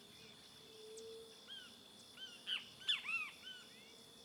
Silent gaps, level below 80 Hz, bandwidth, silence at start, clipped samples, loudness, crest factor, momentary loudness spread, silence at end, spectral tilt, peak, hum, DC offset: none; -86 dBFS; over 20 kHz; 0 s; under 0.1%; -45 LUFS; 22 dB; 19 LU; 0 s; -0.5 dB/octave; -28 dBFS; none; under 0.1%